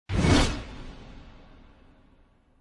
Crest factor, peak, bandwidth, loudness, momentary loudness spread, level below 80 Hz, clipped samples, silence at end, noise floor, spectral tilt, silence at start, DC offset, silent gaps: 20 dB; -8 dBFS; 11.5 kHz; -24 LUFS; 25 LU; -36 dBFS; under 0.1%; 1.3 s; -60 dBFS; -5 dB/octave; 0.1 s; under 0.1%; none